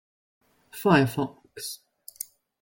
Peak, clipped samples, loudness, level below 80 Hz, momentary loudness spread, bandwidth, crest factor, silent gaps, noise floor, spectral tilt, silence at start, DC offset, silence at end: -8 dBFS; under 0.1%; -26 LUFS; -64 dBFS; 19 LU; 17 kHz; 22 dB; none; -43 dBFS; -5.5 dB/octave; 0.75 s; under 0.1%; 0.85 s